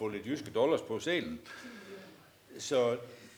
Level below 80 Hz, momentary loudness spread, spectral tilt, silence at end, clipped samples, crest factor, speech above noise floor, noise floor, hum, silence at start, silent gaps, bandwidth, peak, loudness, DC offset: -72 dBFS; 20 LU; -4.5 dB/octave; 0 s; under 0.1%; 18 dB; 23 dB; -56 dBFS; none; 0 s; none; over 20 kHz; -18 dBFS; -33 LUFS; under 0.1%